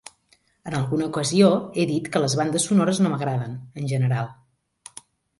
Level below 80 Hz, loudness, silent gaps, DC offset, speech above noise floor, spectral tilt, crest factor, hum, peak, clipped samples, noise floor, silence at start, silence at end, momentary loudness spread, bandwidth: -60 dBFS; -22 LUFS; none; under 0.1%; 41 dB; -5.5 dB/octave; 18 dB; none; -4 dBFS; under 0.1%; -63 dBFS; 0.65 s; 1.05 s; 16 LU; 11.5 kHz